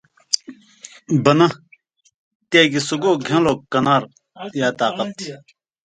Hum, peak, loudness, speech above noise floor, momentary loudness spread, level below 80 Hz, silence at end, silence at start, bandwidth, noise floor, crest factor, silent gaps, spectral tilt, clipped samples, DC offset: none; 0 dBFS; -18 LUFS; 38 dB; 18 LU; -58 dBFS; 0.5 s; 0.3 s; 10 kHz; -55 dBFS; 20 dB; 2.14-2.40 s; -4.5 dB/octave; under 0.1%; under 0.1%